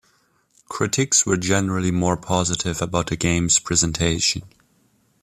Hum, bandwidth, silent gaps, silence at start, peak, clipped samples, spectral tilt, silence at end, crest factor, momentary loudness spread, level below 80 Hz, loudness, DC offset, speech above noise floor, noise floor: none; 14.5 kHz; none; 0.7 s; -4 dBFS; under 0.1%; -3.5 dB/octave; 0.75 s; 18 dB; 7 LU; -44 dBFS; -20 LUFS; under 0.1%; 42 dB; -62 dBFS